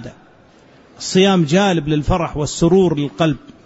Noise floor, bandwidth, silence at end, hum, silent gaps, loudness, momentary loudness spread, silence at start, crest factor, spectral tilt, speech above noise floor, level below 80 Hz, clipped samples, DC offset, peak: -48 dBFS; 8 kHz; 0.15 s; none; none; -16 LUFS; 6 LU; 0 s; 16 dB; -5.5 dB/octave; 32 dB; -34 dBFS; under 0.1%; under 0.1%; -2 dBFS